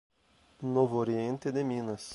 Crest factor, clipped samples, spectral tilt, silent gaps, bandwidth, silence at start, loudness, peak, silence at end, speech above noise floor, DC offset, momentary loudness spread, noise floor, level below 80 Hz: 18 dB; under 0.1%; -7 dB/octave; none; 11.5 kHz; 0.6 s; -32 LUFS; -14 dBFS; 0 s; 35 dB; under 0.1%; 7 LU; -65 dBFS; -70 dBFS